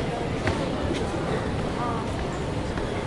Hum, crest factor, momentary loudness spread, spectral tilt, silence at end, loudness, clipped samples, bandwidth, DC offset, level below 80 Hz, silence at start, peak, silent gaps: none; 18 dB; 3 LU; -6 dB/octave; 0 s; -28 LUFS; under 0.1%; 11.5 kHz; under 0.1%; -38 dBFS; 0 s; -8 dBFS; none